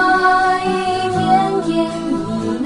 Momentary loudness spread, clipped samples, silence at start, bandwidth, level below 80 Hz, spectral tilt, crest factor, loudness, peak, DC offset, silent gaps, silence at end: 8 LU; under 0.1%; 0 s; 11.5 kHz; -46 dBFS; -5.5 dB/octave; 14 dB; -16 LUFS; -2 dBFS; under 0.1%; none; 0 s